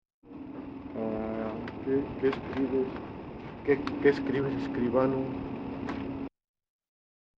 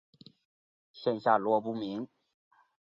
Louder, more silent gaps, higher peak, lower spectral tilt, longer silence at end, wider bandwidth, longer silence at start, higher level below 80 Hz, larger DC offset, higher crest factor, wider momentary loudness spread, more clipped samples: about the same, -31 LUFS vs -31 LUFS; neither; about the same, -10 dBFS vs -10 dBFS; about the same, -8.5 dB/octave vs -8 dB/octave; first, 1.1 s vs 0.85 s; about the same, 6.8 kHz vs 7.4 kHz; second, 0.25 s vs 0.95 s; first, -54 dBFS vs -78 dBFS; neither; about the same, 22 dB vs 24 dB; about the same, 15 LU vs 13 LU; neither